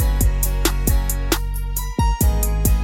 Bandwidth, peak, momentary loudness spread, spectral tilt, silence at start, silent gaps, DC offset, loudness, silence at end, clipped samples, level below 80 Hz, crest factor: 18.5 kHz; -4 dBFS; 5 LU; -4.5 dB/octave; 0 s; none; under 0.1%; -21 LUFS; 0 s; under 0.1%; -20 dBFS; 14 dB